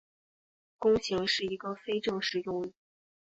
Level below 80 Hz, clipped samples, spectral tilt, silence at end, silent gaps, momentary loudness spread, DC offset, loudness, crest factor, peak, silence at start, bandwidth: -62 dBFS; under 0.1%; -4 dB/octave; 0.65 s; none; 9 LU; under 0.1%; -31 LUFS; 18 dB; -14 dBFS; 0.8 s; 8 kHz